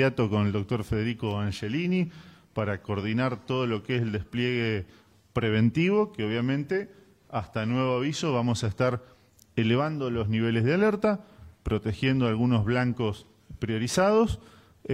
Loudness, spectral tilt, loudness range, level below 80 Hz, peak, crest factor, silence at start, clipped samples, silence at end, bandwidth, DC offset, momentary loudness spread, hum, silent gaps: -27 LUFS; -6.5 dB/octave; 3 LU; -52 dBFS; -10 dBFS; 18 dB; 0 s; under 0.1%; 0 s; 13 kHz; under 0.1%; 11 LU; none; none